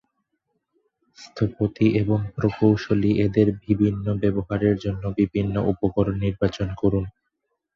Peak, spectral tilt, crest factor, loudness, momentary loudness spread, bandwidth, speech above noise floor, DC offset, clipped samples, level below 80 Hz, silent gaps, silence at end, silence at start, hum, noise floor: -4 dBFS; -9 dB/octave; 18 dB; -23 LUFS; 6 LU; 7 kHz; 55 dB; under 0.1%; under 0.1%; -44 dBFS; none; 0.65 s; 1.2 s; none; -77 dBFS